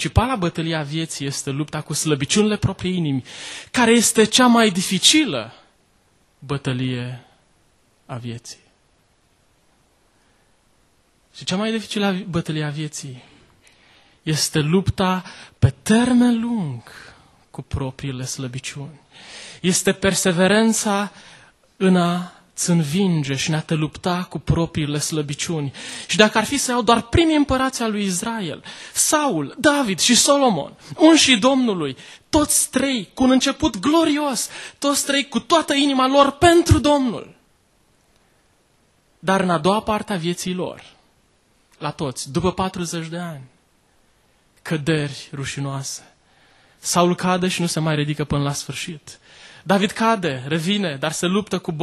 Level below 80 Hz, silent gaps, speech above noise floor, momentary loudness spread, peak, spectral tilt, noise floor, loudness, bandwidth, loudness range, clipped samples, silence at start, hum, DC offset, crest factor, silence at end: -42 dBFS; none; 41 dB; 16 LU; 0 dBFS; -4 dB/octave; -60 dBFS; -19 LUFS; 12.5 kHz; 11 LU; under 0.1%; 0 s; none; under 0.1%; 20 dB; 0 s